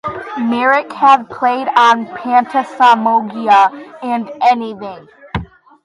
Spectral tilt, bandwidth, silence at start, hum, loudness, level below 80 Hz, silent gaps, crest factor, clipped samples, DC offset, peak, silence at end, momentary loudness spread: -5 dB/octave; 11 kHz; 0.05 s; none; -13 LUFS; -44 dBFS; none; 14 dB; under 0.1%; under 0.1%; 0 dBFS; 0.4 s; 15 LU